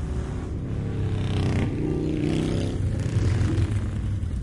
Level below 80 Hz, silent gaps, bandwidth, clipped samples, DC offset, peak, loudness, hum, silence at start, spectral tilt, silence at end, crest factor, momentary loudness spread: -34 dBFS; none; 11.5 kHz; under 0.1%; under 0.1%; -10 dBFS; -26 LUFS; none; 0 s; -7.5 dB/octave; 0 s; 14 dB; 6 LU